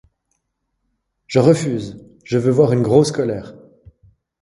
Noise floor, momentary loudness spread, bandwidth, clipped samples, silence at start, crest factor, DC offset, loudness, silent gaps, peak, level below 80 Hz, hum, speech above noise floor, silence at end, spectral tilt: -73 dBFS; 12 LU; 11.5 kHz; under 0.1%; 1.3 s; 18 dB; under 0.1%; -17 LUFS; none; 0 dBFS; -54 dBFS; none; 57 dB; 0.9 s; -7 dB/octave